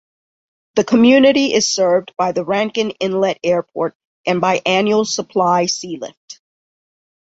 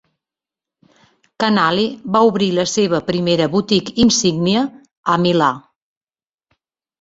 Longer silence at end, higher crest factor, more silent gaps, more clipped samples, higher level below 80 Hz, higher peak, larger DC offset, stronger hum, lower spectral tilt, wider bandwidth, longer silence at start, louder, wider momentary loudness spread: second, 1.05 s vs 1.4 s; about the same, 16 dB vs 18 dB; first, 3.95-4.24 s, 6.17-6.28 s vs 4.97-5.03 s; neither; second, -60 dBFS vs -50 dBFS; about the same, -2 dBFS vs 0 dBFS; neither; neither; about the same, -4 dB/octave vs -4.5 dB/octave; about the same, 8 kHz vs 8 kHz; second, 0.75 s vs 1.4 s; about the same, -16 LUFS vs -16 LUFS; first, 12 LU vs 6 LU